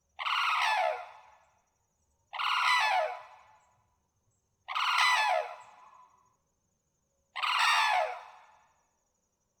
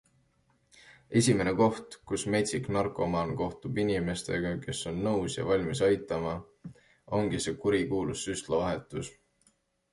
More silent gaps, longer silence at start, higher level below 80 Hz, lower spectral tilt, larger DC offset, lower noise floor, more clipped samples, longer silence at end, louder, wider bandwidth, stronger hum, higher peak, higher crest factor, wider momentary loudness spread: neither; second, 0.2 s vs 0.85 s; second, -82 dBFS vs -54 dBFS; second, 3.5 dB/octave vs -5 dB/octave; neither; first, -78 dBFS vs -70 dBFS; neither; first, 1.3 s vs 0.8 s; about the same, -28 LUFS vs -30 LUFS; first, over 20 kHz vs 11.5 kHz; neither; about the same, -12 dBFS vs -12 dBFS; about the same, 22 dB vs 20 dB; first, 19 LU vs 10 LU